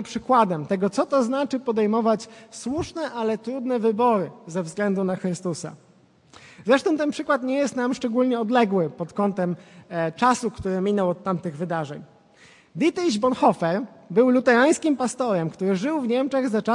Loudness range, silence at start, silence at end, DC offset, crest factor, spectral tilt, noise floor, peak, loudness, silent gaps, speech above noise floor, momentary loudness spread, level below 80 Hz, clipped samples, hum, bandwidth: 4 LU; 0 s; 0 s; under 0.1%; 18 dB; -5.5 dB/octave; -55 dBFS; -4 dBFS; -23 LUFS; none; 32 dB; 10 LU; -62 dBFS; under 0.1%; none; 11.5 kHz